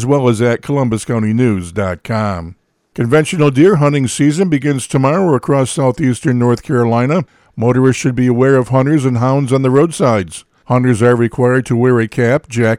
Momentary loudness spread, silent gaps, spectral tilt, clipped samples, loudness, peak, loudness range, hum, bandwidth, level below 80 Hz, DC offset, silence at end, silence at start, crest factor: 7 LU; none; -7 dB/octave; under 0.1%; -13 LUFS; 0 dBFS; 2 LU; none; 12.5 kHz; -48 dBFS; under 0.1%; 0 s; 0 s; 12 dB